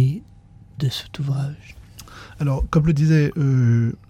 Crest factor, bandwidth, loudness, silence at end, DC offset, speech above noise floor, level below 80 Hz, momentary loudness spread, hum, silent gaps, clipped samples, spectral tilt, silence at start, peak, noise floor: 16 dB; 14.5 kHz; -20 LUFS; 0.15 s; under 0.1%; 27 dB; -38 dBFS; 22 LU; none; none; under 0.1%; -7.5 dB/octave; 0 s; -6 dBFS; -46 dBFS